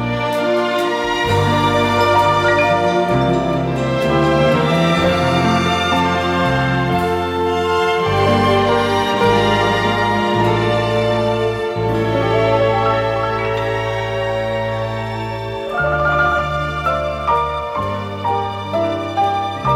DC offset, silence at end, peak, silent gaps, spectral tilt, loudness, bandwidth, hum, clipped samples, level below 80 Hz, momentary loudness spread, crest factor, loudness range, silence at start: under 0.1%; 0 s; -2 dBFS; none; -6 dB/octave; -16 LUFS; 16.5 kHz; none; under 0.1%; -38 dBFS; 6 LU; 14 dB; 4 LU; 0 s